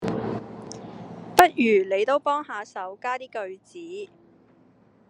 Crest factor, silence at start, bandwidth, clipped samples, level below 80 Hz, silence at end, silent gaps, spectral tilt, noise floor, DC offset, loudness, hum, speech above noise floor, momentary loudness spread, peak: 26 dB; 0 s; 11 kHz; under 0.1%; -62 dBFS; 1.05 s; none; -4.5 dB/octave; -58 dBFS; under 0.1%; -24 LUFS; none; 32 dB; 21 LU; 0 dBFS